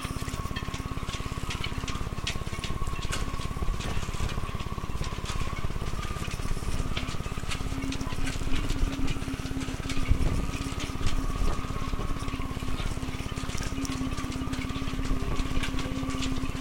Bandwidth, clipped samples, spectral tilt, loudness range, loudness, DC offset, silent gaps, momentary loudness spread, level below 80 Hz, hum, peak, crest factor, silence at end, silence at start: 16.5 kHz; under 0.1%; -5 dB/octave; 2 LU; -33 LUFS; under 0.1%; none; 3 LU; -32 dBFS; none; -8 dBFS; 22 dB; 0 s; 0 s